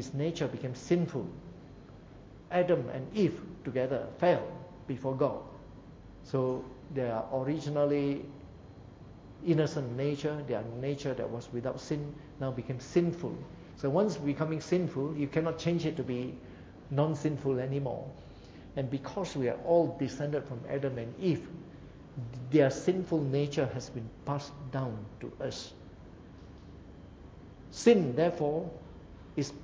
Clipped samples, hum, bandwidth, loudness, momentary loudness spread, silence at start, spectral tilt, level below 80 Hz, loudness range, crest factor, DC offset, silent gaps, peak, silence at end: under 0.1%; none; 8 kHz; -33 LUFS; 22 LU; 0 s; -7 dB/octave; -58 dBFS; 3 LU; 22 dB; under 0.1%; none; -12 dBFS; 0 s